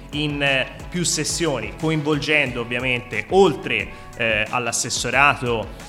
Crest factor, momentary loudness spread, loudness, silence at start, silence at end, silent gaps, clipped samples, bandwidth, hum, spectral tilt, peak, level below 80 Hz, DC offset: 20 dB; 7 LU; -20 LUFS; 0 s; 0 s; none; under 0.1%; 16 kHz; none; -3.5 dB/octave; -2 dBFS; -42 dBFS; under 0.1%